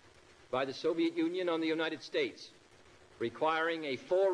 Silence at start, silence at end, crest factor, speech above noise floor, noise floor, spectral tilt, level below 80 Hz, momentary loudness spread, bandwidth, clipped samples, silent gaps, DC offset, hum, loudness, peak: 0.5 s; 0 s; 16 dB; 27 dB; -60 dBFS; -5 dB/octave; -76 dBFS; 8 LU; 10.5 kHz; under 0.1%; none; under 0.1%; none; -34 LUFS; -18 dBFS